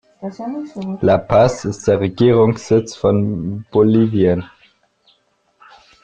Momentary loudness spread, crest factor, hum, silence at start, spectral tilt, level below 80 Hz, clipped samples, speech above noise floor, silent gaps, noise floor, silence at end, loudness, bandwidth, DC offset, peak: 14 LU; 14 dB; none; 0.2 s; -7.5 dB/octave; -48 dBFS; under 0.1%; 45 dB; none; -61 dBFS; 1.55 s; -16 LUFS; 9.2 kHz; under 0.1%; -2 dBFS